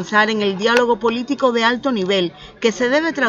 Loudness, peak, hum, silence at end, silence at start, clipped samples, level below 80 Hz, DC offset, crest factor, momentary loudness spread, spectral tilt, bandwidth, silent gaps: -17 LUFS; 0 dBFS; none; 0 s; 0 s; under 0.1%; -54 dBFS; under 0.1%; 18 dB; 5 LU; -4 dB/octave; 9.2 kHz; none